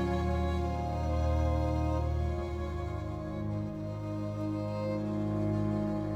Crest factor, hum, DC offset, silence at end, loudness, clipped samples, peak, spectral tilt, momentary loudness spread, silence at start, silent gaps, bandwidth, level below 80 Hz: 14 dB; none; under 0.1%; 0 s; -33 LUFS; under 0.1%; -18 dBFS; -8.5 dB/octave; 7 LU; 0 s; none; 8.2 kHz; -38 dBFS